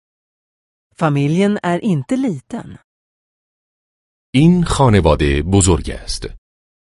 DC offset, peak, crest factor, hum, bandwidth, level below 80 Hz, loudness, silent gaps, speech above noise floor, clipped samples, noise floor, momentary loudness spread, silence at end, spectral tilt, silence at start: under 0.1%; 0 dBFS; 16 dB; none; 11.5 kHz; -30 dBFS; -15 LUFS; 2.84-4.33 s; over 75 dB; under 0.1%; under -90 dBFS; 14 LU; 0.5 s; -6 dB/octave; 1 s